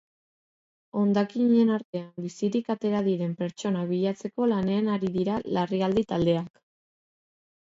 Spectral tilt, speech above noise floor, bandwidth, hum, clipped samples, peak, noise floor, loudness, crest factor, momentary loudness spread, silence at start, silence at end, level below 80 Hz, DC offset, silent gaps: -7.5 dB/octave; over 64 dB; 7.8 kHz; none; under 0.1%; -12 dBFS; under -90 dBFS; -26 LUFS; 16 dB; 8 LU; 0.95 s; 1.25 s; -62 dBFS; under 0.1%; 1.85-1.93 s